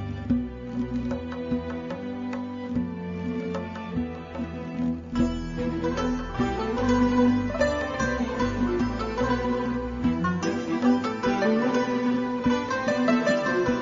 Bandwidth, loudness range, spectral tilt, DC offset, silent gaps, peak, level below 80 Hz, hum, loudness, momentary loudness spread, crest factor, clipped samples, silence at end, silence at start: 7.6 kHz; 7 LU; -6.5 dB/octave; under 0.1%; none; -8 dBFS; -42 dBFS; none; -27 LUFS; 9 LU; 18 dB; under 0.1%; 0 s; 0 s